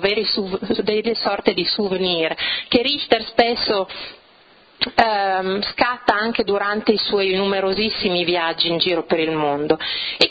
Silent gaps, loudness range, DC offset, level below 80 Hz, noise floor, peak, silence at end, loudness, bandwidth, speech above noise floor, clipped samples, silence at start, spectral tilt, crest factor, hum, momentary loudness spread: none; 1 LU; under 0.1%; -50 dBFS; -51 dBFS; 0 dBFS; 0 s; -19 LUFS; 8 kHz; 31 dB; under 0.1%; 0 s; -5.5 dB/octave; 20 dB; none; 4 LU